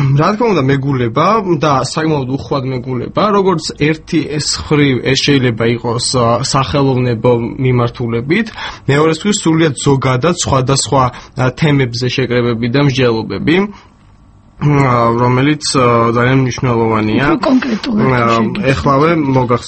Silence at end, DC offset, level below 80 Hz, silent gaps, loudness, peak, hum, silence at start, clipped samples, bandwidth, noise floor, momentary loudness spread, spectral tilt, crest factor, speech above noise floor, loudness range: 0 s; under 0.1%; -38 dBFS; none; -13 LUFS; 0 dBFS; none; 0 s; under 0.1%; 8.8 kHz; -43 dBFS; 5 LU; -5.5 dB/octave; 12 dB; 31 dB; 2 LU